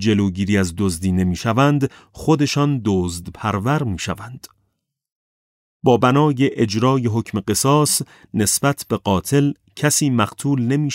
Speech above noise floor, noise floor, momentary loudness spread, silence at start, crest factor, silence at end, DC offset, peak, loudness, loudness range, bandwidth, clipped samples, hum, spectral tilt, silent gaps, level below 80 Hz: 54 dB; -72 dBFS; 8 LU; 0 s; 16 dB; 0 s; under 0.1%; -2 dBFS; -19 LUFS; 4 LU; 16 kHz; under 0.1%; none; -5 dB/octave; 5.12-5.80 s; -46 dBFS